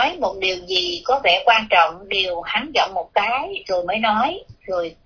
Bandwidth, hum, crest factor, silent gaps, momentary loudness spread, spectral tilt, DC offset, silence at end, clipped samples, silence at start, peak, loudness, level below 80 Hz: 5.4 kHz; none; 18 dB; none; 9 LU; -2.5 dB/octave; under 0.1%; 0.1 s; under 0.1%; 0 s; -2 dBFS; -19 LUFS; -52 dBFS